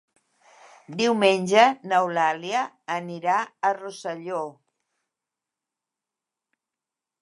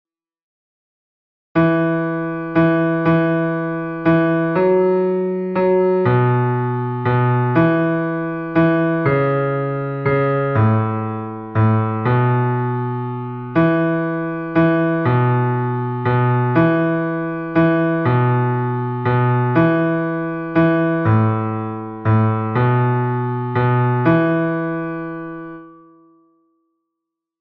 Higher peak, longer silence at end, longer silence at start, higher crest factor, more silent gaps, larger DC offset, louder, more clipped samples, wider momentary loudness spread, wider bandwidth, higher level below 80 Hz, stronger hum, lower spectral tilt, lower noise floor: about the same, -2 dBFS vs -4 dBFS; first, 2.7 s vs 1.7 s; second, 0.9 s vs 1.55 s; first, 24 dB vs 14 dB; neither; neither; second, -23 LUFS vs -18 LUFS; neither; first, 14 LU vs 8 LU; first, 11.5 kHz vs 4.7 kHz; second, -80 dBFS vs -50 dBFS; neither; second, -4 dB/octave vs -11.5 dB/octave; first, -88 dBFS vs -81 dBFS